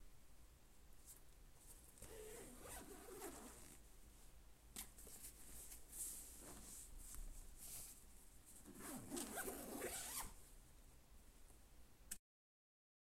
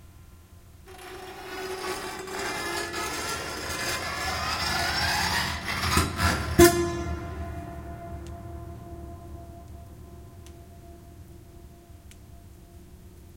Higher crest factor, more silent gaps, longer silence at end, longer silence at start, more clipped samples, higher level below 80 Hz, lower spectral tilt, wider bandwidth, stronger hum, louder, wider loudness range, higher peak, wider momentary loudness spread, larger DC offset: about the same, 24 dB vs 26 dB; neither; first, 1 s vs 0 s; about the same, 0 s vs 0 s; neither; second, -64 dBFS vs -44 dBFS; second, -2.5 dB/octave vs -4 dB/octave; about the same, 16 kHz vs 16.5 kHz; neither; second, -54 LUFS vs -27 LUFS; second, 7 LU vs 23 LU; second, -32 dBFS vs -4 dBFS; second, 19 LU vs 24 LU; neither